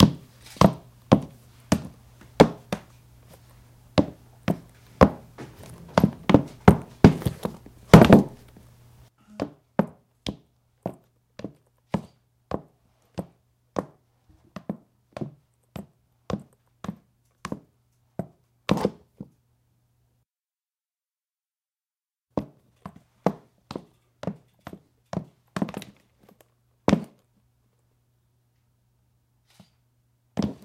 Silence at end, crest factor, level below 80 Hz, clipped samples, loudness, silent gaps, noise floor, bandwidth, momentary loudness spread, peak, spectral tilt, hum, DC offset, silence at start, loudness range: 0.1 s; 26 dB; -44 dBFS; under 0.1%; -23 LUFS; none; under -90 dBFS; 16 kHz; 27 LU; -2 dBFS; -7 dB/octave; none; under 0.1%; 0 s; 20 LU